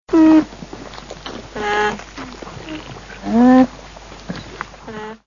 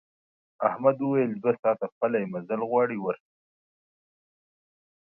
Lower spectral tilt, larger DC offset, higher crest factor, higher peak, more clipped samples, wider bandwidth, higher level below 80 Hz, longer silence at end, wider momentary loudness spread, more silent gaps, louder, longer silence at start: second, -5.5 dB/octave vs -11.5 dB/octave; neither; about the same, 18 dB vs 22 dB; first, 0 dBFS vs -8 dBFS; neither; first, 7.4 kHz vs 3 kHz; first, -44 dBFS vs -78 dBFS; second, 0.1 s vs 1.95 s; first, 22 LU vs 7 LU; second, none vs 1.59-1.63 s, 1.92-2.01 s; first, -14 LUFS vs -27 LUFS; second, 0.1 s vs 0.6 s